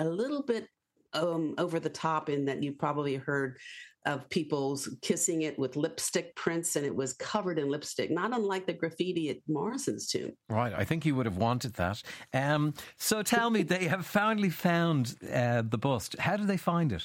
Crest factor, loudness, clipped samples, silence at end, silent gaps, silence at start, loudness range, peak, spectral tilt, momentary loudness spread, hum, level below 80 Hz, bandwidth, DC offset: 16 dB; -31 LUFS; under 0.1%; 0 s; none; 0 s; 4 LU; -14 dBFS; -5 dB/octave; 6 LU; none; -64 dBFS; 16.5 kHz; under 0.1%